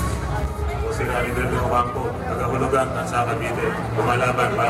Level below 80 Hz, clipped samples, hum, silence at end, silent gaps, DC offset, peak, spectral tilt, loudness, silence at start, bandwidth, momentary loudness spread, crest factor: -32 dBFS; under 0.1%; none; 0 s; none; under 0.1%; -6 dBFS; -6 dB/octave; -22 LUFS; 0 s; 15.5 kHz; 6 LU; 16 dB